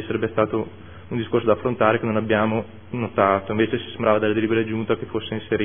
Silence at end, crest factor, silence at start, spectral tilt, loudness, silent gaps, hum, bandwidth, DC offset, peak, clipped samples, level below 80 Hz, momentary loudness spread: 0 s; 20 dB; 0 s; -11 dB/octave; -22 LUFS; none; none; 3.6 kHz; 0.5%; -2 dBFS; under 0.1%; -54 dBFS; 9 LU